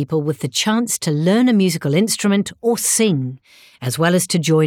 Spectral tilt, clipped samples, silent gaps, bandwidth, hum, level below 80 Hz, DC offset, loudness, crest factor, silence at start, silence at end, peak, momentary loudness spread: -4.5 dB/octave; under 0.1%; none; 18.5 kHz; none; -62 dBFS; under 0.1%; -17 LUFS; 12 dB; 0 s; 0 s; -4 dBFS; 6 LU